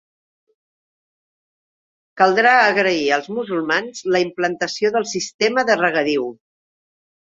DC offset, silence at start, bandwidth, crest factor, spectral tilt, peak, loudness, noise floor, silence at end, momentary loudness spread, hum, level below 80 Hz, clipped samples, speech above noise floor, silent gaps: under 0.1%; 2.15 s; 7.8 kHz; 18 dB; -3.5 dB/octave; -2 dBFS; -18 LUFS; under -90 dBFS; 0.95 s; 10 LU; none; -66 dBFS; under 0.1%; over 72 dB; 5.34-5.39 s